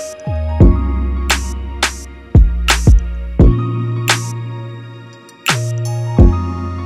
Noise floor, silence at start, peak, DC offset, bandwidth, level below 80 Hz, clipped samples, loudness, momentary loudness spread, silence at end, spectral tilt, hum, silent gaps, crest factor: -36 dBFS; 0 s; 0 dBFS; under 0.1%; 15.5 kHz; -16 dBFS; under 0.1%; -15 LUFS; 14 LU; 0 s; -5 dB/octave; none; none; 14 dB